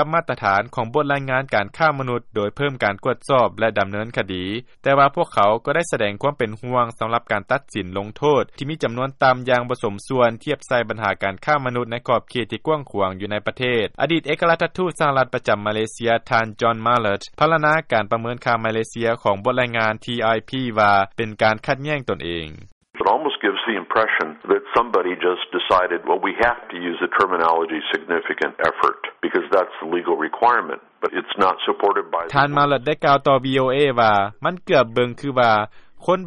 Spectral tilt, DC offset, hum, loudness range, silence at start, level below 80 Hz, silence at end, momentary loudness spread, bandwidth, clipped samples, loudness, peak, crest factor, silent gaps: -5.5 dB/octave; under 0.1%; none; 3 LU; 0 s; -54 dBFS; 0 s; 8 LU; 11.5 kHz; under 0.1%; -20 LUFS; -4 dBFS; 16 dB; 22.72-22.81 s